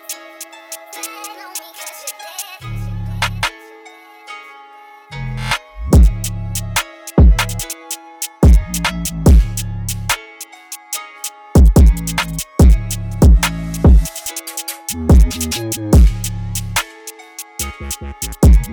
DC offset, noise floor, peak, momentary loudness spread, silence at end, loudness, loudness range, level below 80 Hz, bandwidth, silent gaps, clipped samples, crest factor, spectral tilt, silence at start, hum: under 0.1%; -40 dBFS; -4 dBFS; 18 LU; 0 s; -16 LUFS; 11 LU; -16 dBFS; 19.5 kHz; none; under 0.1%; 12 dB; -5 dB/octave; 0.1 s; none